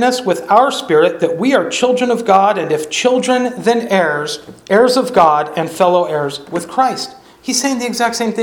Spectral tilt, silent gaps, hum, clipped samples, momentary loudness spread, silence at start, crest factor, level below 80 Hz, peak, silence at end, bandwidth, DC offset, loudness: -3.5 dB/octave; none; none; under 0.1%; 9 LU; 0 s; 14 dB; -58 dBFS; 0 dBFS; 0 s; 19 kHz; under 0.1%; -14 LUFS